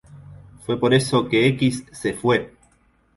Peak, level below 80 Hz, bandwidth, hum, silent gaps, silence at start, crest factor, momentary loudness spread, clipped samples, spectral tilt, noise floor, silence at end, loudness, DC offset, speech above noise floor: -4 dBFS; -52 dBFS; 11.5 kHz; none; none; 0.15 s; 18 dB; 10 LU; under 0.1%; -5.5 dB/octave; -60 dBFS; 0.7 s; -20 LUFS; under 0.1%; 40 dB